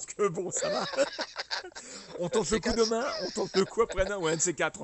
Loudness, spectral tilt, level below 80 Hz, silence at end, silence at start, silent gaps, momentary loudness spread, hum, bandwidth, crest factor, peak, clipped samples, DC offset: -30 LUFS; -3 dB/octave; -50 dBFS; 0 s; 0 s; none; 9 LU; none; 8.4 kHz; 18 dB; -12 dBFS; under 0.1%; under 0.1%